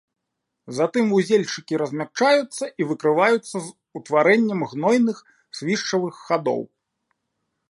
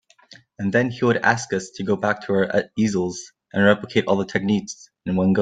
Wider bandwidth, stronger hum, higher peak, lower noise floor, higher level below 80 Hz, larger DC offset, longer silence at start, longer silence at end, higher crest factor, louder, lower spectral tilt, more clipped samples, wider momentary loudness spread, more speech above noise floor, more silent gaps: first, 11.5 kHz vs 9.2 kHz; neither; about the same, -4 dBFS vs -2 dBFS; first, -80 dBFS vs -50 dBFS; second, -74 dBFS vs -58 dBFS; neither; about the same, 0.65 s vs 0.6 s; first, 1.05 s vs 0 s; about the same, 18 dB vs 20 dB; about the same, -21 LUFS vs -21 LUFS; about the same, -5 dB/octave vs -5.5 dB/octave; neither; first, 14 LU vs 10 LU; first, 59 dB vs 30 dB; neither